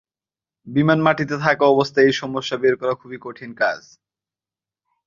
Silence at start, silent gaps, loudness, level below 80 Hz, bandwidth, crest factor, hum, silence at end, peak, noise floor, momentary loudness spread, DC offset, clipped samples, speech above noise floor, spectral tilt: 0.65 s; none; -19 LUFS; -60 dBFS; 7.4 kHz; 20 dB; none; 1.3 s; -2 dBFS; under -90 dBFS; 16 LU; under 0.1%; under 0.1%; over 71 dB; -6 dB/octave